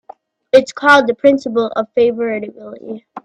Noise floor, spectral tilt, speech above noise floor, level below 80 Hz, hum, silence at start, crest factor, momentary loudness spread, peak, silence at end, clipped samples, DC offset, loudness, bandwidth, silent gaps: -42 dBFS; -4.5 dB/octave; 27 dB; -58 dBFS; none; 0.55 s; 16 dB; 20 LU; 0 dBFS; 0.05 s; under 0.1%; under 0.1%; -14 LUFS; 10.5 kHz; none